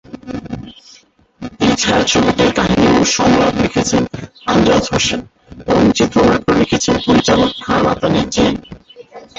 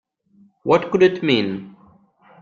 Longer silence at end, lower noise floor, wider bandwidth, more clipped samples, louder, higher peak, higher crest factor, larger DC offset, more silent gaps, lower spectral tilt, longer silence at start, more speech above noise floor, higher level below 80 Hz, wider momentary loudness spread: second, 0.15 s vs 0.75 s; second, -47 dBFS vs -55 dBFS; first, 8 kHz vs 7.2 kHz; neither; first, -13 LUFS vs -18 LUFS; about the same, 0 dBFS vs -2 dBFS; about the same, 14 dB vs 18 dB; neither; neither; second, -4.5 dB/octave vs -6.5 dB/octave; second, 0.15 s vs 0.65 s; second, 34 dB vs 38 dB; first, -36 dBFS vs -60 dBFS; about the same, 15 LU vs 14 LU